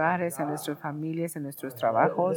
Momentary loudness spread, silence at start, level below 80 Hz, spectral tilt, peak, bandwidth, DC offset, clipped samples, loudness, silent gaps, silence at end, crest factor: 10 LU; 0 s; -78 dBFS; -6 dB/octave; -8 dBFS; 19 kHz; under 0.1%; under 0.1%; -29 LUFS; none; 0 s; 18 dB